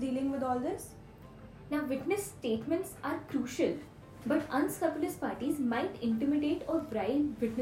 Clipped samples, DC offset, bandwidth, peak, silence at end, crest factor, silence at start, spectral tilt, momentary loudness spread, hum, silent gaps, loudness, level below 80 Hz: under 0.1%; under 0.1%; 16 kHz; -16 dBFS; 0 s; 16 dB; 0 s; -5.5 dB/octave; 12 LU; none; none; -34 LUFS; -62 dBFS